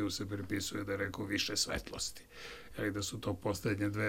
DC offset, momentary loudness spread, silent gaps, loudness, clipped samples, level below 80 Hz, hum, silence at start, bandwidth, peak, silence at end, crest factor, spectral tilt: under 0.1%; 9 LU; none; -37 LUFS; under 0.1%; -58 dBFS; none; 0 s; 17 kHz; -18 dBFS; 0 s; 18 dB; -4 dB/octave